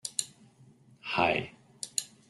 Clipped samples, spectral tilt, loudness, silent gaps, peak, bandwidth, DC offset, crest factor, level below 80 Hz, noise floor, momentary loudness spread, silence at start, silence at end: under 0.1%; -2 dB/octave; -31 LUFS; none; -10 dBFS; 12.5 kHz; under 0.1%; 26 dB; -66 dBFS; -59 dBFS; 18 LU; 0.05 s; 0.25 s